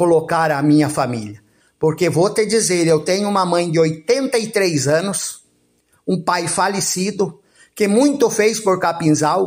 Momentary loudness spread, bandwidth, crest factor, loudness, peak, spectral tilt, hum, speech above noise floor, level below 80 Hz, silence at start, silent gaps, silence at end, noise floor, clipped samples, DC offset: 8 LU; 16 kHz; 14 dB; -17 LUFS; -4 dBFS; -4.5 dB/octave; none; 44 dB; -60 dBFS; 0 s; none; 0 s; -60 dBFS; under 0.1%; under 0.1%